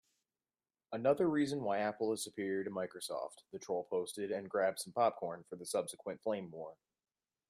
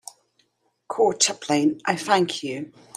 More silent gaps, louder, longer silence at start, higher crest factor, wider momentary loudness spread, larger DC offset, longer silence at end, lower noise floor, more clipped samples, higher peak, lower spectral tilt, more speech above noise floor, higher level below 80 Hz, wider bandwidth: neither; second, -38 LUFS vs -22 LUFS; about the same, 0.9 s vs 0.9 s; about the same, 18 dB vs 22 dB; about the same, 13 LU vs 15 LU; neither; first, 0.75 s vs 0.3 s; first, under -90 dBFS vs -68 dBFS; neither; second, -20 dBFS vs -2 dBFS; first, -4.5 dB/octave vs -3 dB/octave; first, over 53 dB vs 45 dB; second, -82 dBFS vs -72 dBFS; about the same, 14.5 kHz vs 15 kHz